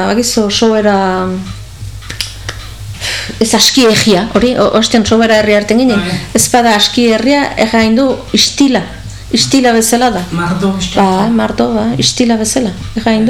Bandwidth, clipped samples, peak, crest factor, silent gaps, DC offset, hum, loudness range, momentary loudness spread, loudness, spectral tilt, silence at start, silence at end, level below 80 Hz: 18.5 kHz; under 0.1%; 0 dBFS; 10 dB; none; 1%; none; 4 LU; 12 LU; -10 LUFS; -3.5 dB/octave; 0 s; 0 s; -34 dBFS